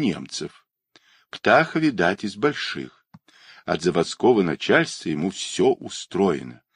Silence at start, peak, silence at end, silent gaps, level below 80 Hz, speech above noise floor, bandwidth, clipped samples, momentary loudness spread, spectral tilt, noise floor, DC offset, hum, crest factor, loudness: 0 s; -2 dBFS; 0.2 s; none; -60 dBFS; 37 dB; 11 kHz; under 0.1%; 14 LU; -5 dB/octave; -59 dBFS; under 0.1%; none; 20 dB; -22 LUFS